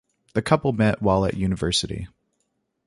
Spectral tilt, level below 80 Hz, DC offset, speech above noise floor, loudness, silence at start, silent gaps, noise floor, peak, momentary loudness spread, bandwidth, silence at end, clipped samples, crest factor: -5.5 dB/octave; -42 dBFS; under 0.1%; 52 dB; -23 LUFS; 0.35 s; none; -74 dBFS; -4 dBFS; 12 LU; 11.5 kHz; 0.8 s; under 0.1%; 20 dB